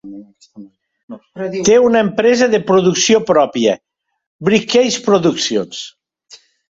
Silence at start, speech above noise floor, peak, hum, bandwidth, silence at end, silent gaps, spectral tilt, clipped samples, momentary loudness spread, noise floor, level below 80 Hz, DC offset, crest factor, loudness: 0.05 s; 32 dB; -2 dBFS; none; 8 kHz; 0.85 s; 1.03-1.08 s, 4.26-4.39 s; -4 dB/octave; under 0.1%; 15 LU; -45 dBFS; -56 dBFS; under 0.1%; 14 dB; -13 LUFS